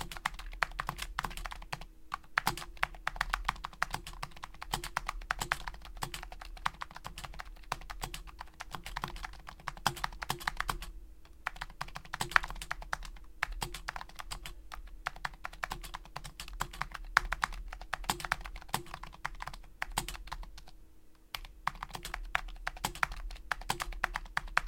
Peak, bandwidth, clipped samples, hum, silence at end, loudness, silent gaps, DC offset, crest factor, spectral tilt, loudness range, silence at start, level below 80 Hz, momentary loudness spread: -2 dBFS; 17 kHz; under 0.1%; none; 0 s; -38 LUFS; none; under 0.1%; 38 dB; -2 dB/octave; 6 LU; 0 s; -48 dBFS; 12 LU